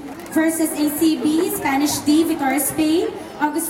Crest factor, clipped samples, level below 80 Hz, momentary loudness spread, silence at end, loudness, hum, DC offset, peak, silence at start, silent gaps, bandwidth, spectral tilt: 14 dB; under 0.1%; -52 dBFS; 5 LU; 0 s; -19 LUFS; none; under 0.1%; -6 dBFS; 0 s; none; 16.5 kHz; -3.5 dB/octave